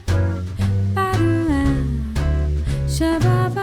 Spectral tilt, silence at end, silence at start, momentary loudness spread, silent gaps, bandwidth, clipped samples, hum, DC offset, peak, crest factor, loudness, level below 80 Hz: -7 dB/octave; 0 s; 0 s; 5 LU; none; 15 kHz; under 0.1%; none; under 0.1%; -6 dBFS; 12 dB; -20 LUFS; -26 dBFS